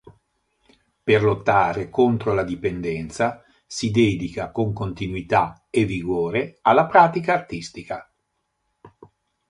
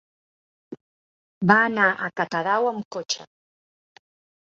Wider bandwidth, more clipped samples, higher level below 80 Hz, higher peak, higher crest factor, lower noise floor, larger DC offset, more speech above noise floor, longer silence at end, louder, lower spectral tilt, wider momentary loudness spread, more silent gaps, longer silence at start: first, 11 kHz vs 8 kHz; neither; first, -48 dBFS vs -70 dBFS; about the same, -2 dBFS vs -2 dBFS; about the same, 22 dB vs 24 dB; second, -74 dBFS vs under -90 dBFS; neither; second, 53 dB vs over 68 dB; second, 0.6 s vs 1.25 s; about the same, -21 LUFS vs -22 LUFS; first, -6 dB/octave vs -4.5 dB/octave; about the same, 13 LU vs 12 LU; second, none vs 0.81-1.41 s, 2.85-2.91 s; second, 0.05 s vs 0.7 s